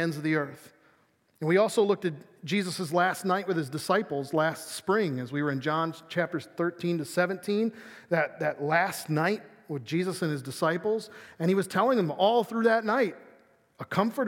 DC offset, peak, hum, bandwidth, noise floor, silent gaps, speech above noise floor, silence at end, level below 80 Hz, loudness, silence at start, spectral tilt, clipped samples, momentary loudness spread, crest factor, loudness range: under 0.1%; -10 dBFS; none; 17 kHz; -66 dBFS; none; 39 dB; 0 s; -80 dBFS; -28 LUFS; 0 s; -5.5 dB/octave; under 0.1%; 8 LU; 18 dB; 3 LU